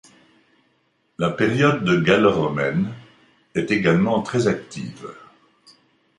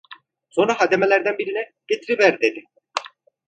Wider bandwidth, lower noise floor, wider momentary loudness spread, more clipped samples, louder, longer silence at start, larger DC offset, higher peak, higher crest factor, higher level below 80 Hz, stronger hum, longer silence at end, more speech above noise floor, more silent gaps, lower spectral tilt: first, 11 kHz vs 9.2 kHz; first, -66 dBFS vs -47 dBFS; first, 17 LU vs 13 LU; neither; about the same, -20 LUFS vs -20 LUFS; first, 1.2 s vs 0.1 s; neither; about the same, -2 dBFS vs -2 dBFS; about the same, 20 dB vs 20 dB; first, -54 dBFS vs -70 dBFS; neither; first, 1 s vs 0.4 s; first, 46 dB vs 27 dB; neither; first, -6.5 dB/octave vs -4 dB/octave